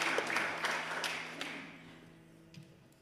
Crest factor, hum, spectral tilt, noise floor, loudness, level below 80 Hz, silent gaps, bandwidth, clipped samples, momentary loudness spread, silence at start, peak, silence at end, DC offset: 22 dB; none; -2 dB/octave; -58 dBFS; -36 LUFS; -78 dBFS; none; 15.5 kHz; under 0.1%; 23 LU; 0 s; -18 dBFS; 0.1 s; under 0.1%